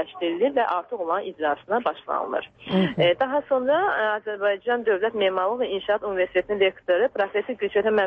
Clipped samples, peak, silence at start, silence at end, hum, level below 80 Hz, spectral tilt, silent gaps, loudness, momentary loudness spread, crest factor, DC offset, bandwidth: under 0.1%; -8 dBFS; 0 s; 0 s; none; -62 dBFS; -8 dB/octave; none; -24 LUFS; 6 LU; 14 dB; under 0.1%; 5.6 kHz